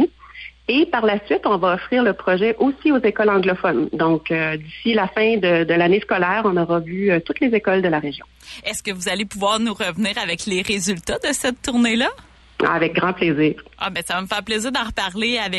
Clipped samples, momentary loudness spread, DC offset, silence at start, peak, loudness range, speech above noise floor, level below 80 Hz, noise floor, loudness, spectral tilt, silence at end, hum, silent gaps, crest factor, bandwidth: under 0.1%; 7 LU; under 0.1%; 0 s; -6 dBFS; 3 LU; 20 dB; -48 dBFS; -40 dBFS; -19 LUFS; -4.5 dB/octave; 0 s; none; none; 14 dB; 12 kHz